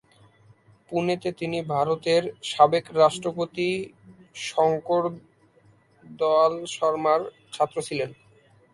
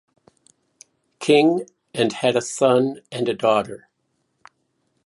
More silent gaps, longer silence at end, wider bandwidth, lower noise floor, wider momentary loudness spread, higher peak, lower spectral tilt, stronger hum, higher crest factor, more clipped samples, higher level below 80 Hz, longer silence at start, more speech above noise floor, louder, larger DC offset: neither; second, 0.6 s vs 1.3 s; about the same, 11.5 kHz vs 11.5 kHz; second, -59 dBFS vs -71 dBFS; about the same, 11 LU vs 13 LU; about the same, -4 dBFS vs -4 dBFS; about the same, -5 dB/octave vs -4.5 dB/octave; neither; about the same, 22 dB vs 20 dB; neither; about the same, -68 dBFS vs -68 dBFS; second, 0.9 s vs 1.2 s; second, 35 dB vs 52 dB; second, -24 LUFS vs -20 LUFS; neither